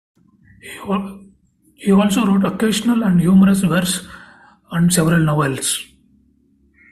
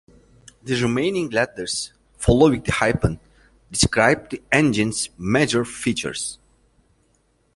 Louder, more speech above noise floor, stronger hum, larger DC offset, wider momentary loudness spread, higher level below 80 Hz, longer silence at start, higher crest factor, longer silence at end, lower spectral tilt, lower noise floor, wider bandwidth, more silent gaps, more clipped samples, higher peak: first, -16 LUFS vs -21 LUFS; about the same, 41 dB vs 43 dB; neither; neither; first, 15 LU vs 11 LU; second, -48 dBFS vs -40 dBFS; about the same, 0.65 s vs 0.65 s; about the same, 16 dB vs 20 dB; about the same, 1.1 s vs 1.2 s; about the same, -5.5 dB/octave vs -4.5 dB/octave; second, -57 dBFS vs -63 dBFS; first, 14.5 kHz vs 11.5 kHz; neither; neither; about the same, -2 dBFS vs -2 dBFS